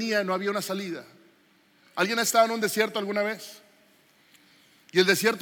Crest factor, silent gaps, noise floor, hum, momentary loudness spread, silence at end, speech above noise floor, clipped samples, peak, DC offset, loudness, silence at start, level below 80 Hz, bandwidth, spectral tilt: 20 dB; none; -62 dBFS; none; 16 LU; 0 s; 36 dB; under 0.1%; -8 dBFS; under 0.1%; -25 LUFS; 0 s; -88 dBFS; 17 kHz; -3 dB/octave